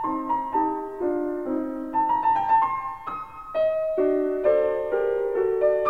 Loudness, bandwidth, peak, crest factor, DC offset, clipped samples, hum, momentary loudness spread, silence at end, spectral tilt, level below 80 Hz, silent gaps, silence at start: -24 LUFS; 4.8 kHz; -8 dBFS; 14 dB; 0.3%; under 0.1%; none; 8 LU; 0 s; -7.5 dB/octave; -56 dBFS; none; 0 s